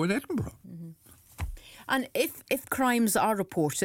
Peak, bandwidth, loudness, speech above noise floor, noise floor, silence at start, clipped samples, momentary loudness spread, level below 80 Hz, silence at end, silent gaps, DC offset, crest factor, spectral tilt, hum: -14 dBFS; 18 kHz; -28 LUFS; 25 dB; -53 dBFS; 0 s; under 0.1%; 20 LU; -50 dBFS; 0 s; none; under 0.1%; 16 dB; -4.5 dB/octave; none